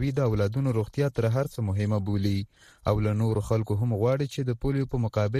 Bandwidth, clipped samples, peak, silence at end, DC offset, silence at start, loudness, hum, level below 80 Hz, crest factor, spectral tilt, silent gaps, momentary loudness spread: 13.5 kHz; under 0.1%; -10 dBFS; 0 s; under 0.1%; 0 s; -27 LUFS; none; -46 dBFS; 16 dB; -8 dB/octave; none; 4 LU